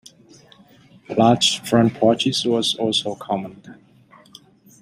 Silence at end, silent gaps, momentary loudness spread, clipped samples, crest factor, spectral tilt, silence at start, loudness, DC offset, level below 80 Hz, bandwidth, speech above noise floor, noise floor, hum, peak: 1.1 s; none; 11 LU; under 0.1%; 20 dB; -4.5 dB/octave; 1.1 s; -19 LUFS; under 0.1%; -60 dBFS; 15.5 kHz; 32 dB; -51 dBFS; none; -2 dBFS